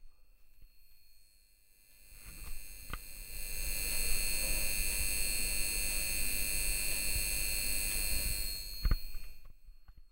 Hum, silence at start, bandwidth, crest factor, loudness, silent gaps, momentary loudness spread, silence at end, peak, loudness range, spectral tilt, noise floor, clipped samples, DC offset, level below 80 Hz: none; 0 s; 16 kHz; 18 dB; -34 LUFS; none; 16 LU; 0.05 s; -16 dBFS; 14 LU; -1 dB/octave; -63 dBFS; under 0.1%; under 0.1%; -40 dBFS